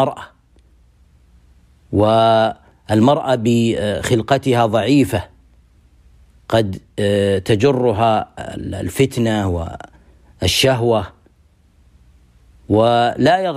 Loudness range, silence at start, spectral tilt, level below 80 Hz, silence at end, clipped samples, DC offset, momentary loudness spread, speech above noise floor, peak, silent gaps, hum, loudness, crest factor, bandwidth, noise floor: 3 LU; 0 s; -6 dB/octave; -44 dBFS; 0 s; under 0.1%; under 0.1%; 11 LU; 38 dB; -4 dBFS; none; none; -16 LUFS; 14 dB; 15.5 kHz; -53 dBFS